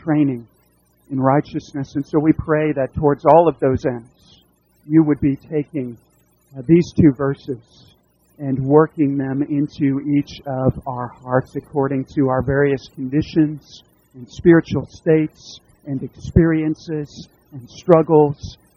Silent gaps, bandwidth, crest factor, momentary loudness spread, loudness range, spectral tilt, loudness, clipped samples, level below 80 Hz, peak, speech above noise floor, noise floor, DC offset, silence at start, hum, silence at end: none; 7 kHz; 18 dB; 15 LU; 3 LU; -8.5 dB/octave; -18 LUFS; under 0.1%; -42 dBFS; 0 dBFS; 41 dB; -58 dBFS; under 0.1%; 0.05 s; none; 0.25 s